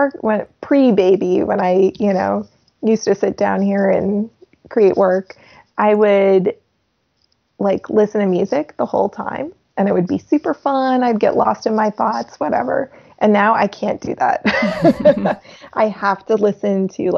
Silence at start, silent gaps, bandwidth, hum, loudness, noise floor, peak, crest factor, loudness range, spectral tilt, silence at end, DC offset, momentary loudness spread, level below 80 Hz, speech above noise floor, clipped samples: 0 s; none; 7 kHz; none; -17 LUFS; -66 dBFS; 0 dBFS; 16 dB; 2 LU; -7 dB/octave; 0 s; under 0.1%; 9 LU; -56 dBFS; 50 dB; under 0.1%